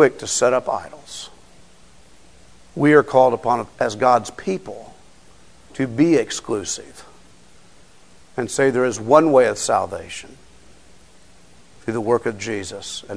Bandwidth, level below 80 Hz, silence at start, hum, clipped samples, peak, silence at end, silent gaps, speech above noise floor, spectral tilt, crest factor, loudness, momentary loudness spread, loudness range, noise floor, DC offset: 11 kHz; -56 dBFS; 0 s; none; under 0.1%; 0 dBFS; 0 s; none; 32 dB; -4.5 dB/octave; 20 dB; -19 LUFS; 19 LU; 5 LU; -51 dBFS; 0.4%